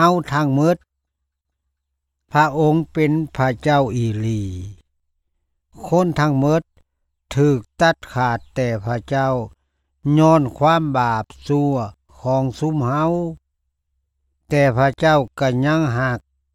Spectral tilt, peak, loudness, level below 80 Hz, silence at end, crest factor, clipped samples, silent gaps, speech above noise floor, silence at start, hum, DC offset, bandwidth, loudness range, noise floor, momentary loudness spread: -7 dB/octave; -2 dBFS; -19 LUFS; -46 dBFS; 0.35 s; 16 dB; under 0.1%; none; 60 dB; 0 s; none; under 0.1%; 14 kHz; 3 LU; -77 dBFS; 10 LU